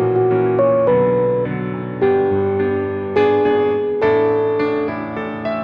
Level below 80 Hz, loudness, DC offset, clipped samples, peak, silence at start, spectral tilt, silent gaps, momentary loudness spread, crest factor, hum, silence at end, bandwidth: -54 dBFS; -17 LUFS; under 0.1%; under 0.1%; -2 dBFS; 0 s; -9.5 dB/octave; none; 8 LU; 14 dB; none; 0 s; 5.2 kHz